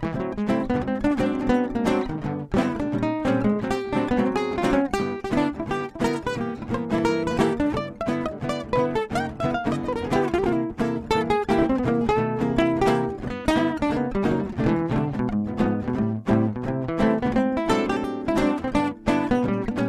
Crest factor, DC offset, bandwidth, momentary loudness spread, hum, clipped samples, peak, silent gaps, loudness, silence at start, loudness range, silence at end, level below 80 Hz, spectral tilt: 18 dB; under 0.1%; 13.5 kHz; 5 LU; none; under 0.1%; -6 dBFS; none; -24 LUFS; 0 s; 2 LU; 0 s; -42 dBFS; -7 dB/octave